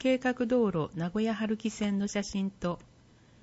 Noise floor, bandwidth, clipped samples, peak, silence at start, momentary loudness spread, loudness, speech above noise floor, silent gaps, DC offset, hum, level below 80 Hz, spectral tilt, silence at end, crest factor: -59 dBFS; 8 kHz; under 0.1%; -14 dBFS; 0 s; 7 LU; -31 LUFS; 29 dB; none; under 0.1%; none; -58 dBFS; -6 dB/octave; 0.65 s; 16 dB